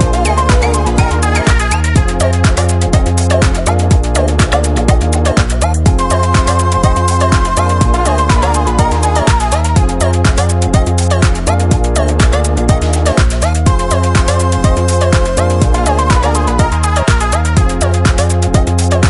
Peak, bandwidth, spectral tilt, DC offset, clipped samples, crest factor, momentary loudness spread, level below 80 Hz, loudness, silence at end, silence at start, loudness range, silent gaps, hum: 0 dBFS; 11.5 kHz; -5.5 dB/octave; under 0.1%; under 0.1%; 10 dB; 1 LU; -14 dBFS; -12 LUFS; 0 s; 0 s; 0 LU; none; none